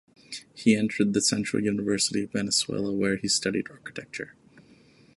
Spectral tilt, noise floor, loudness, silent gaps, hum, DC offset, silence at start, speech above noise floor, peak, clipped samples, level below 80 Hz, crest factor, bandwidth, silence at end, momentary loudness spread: -3.5 dB/octave; -56 dBFS; -25 LUFS; none; none; under 0.1%; 0.3 s; 30 dB; -8 dBFS; under 0.1%; -62 dBFS; 20 dB; 11.5 kHz; 0.55 s; 16 LU